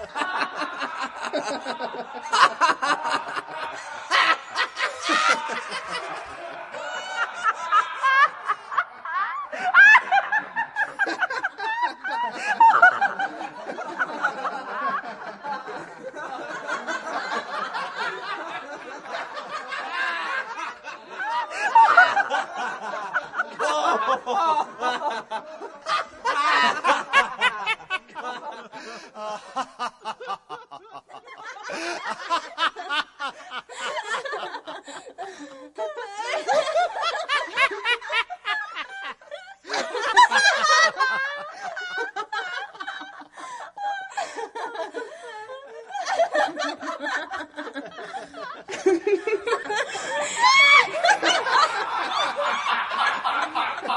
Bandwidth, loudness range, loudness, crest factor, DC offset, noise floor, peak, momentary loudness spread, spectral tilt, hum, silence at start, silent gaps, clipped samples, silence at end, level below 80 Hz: 11.5 kHz; 12 LU; -23 LUFS; 24 dB; under 0.1%; -44 dBFS; -2 dBFS; 19 LU; -0.5 dB/octave; none; 0 s; none; under 0.1%; 0 s; -72 dBFS